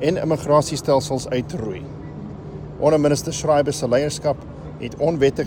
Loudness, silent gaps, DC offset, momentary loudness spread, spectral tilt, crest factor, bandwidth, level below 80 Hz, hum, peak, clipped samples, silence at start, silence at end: -20 LUFS; none; under 0.1%; 16 LU; -5.5 dB/octave; 16 dB; 17.5 kHz; -44 dBFS; none; -4 dBFS; under 0.1%; 0 s; 0 s